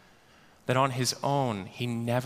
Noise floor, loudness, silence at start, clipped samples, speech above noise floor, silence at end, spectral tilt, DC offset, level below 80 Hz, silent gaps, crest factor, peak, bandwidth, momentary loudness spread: -58 dBFS; -29 LUFS; 0.65 s; under 0.1%; 30 dB; 0 s; -5 dB/octave; under 0.1%; -66 dBFS; none; 20 dB; -10 dBFS; 15.5 kHz; 7 LU